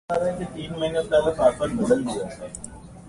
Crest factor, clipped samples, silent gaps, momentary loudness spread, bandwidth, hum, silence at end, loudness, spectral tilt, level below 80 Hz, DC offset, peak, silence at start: 18 dB; under 0.1%; none; 15 LU; 11.5 kHz; none; 0 s; -24 LUFS; -5.5 dB/octave; -48 dBFS; under 0.1%; -6 dBFS; 0.1 s